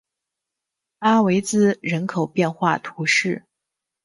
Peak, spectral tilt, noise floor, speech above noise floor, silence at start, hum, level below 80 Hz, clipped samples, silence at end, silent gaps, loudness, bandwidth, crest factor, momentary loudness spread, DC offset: -4 dBFS; -5 dB/octave; -84 dBFS; 64 dB; 1 s; none; -64 dBFS; under 0.1%; 0.65 s; none; -20 LUFS; 11.5 kHz; 18 dB; 6 LU; under 0.1%